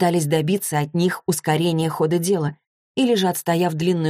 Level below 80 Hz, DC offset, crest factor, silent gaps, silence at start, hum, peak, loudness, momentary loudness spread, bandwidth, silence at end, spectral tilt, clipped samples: -62 dBFS; under 0.1%; 14 dB; 2.67-2.95 s; 0 s; none; -6 dBFS; -21 LUFS; 4 LU; 15.5 kHz; 0 s; -5.5 dB/octave; under 0.1%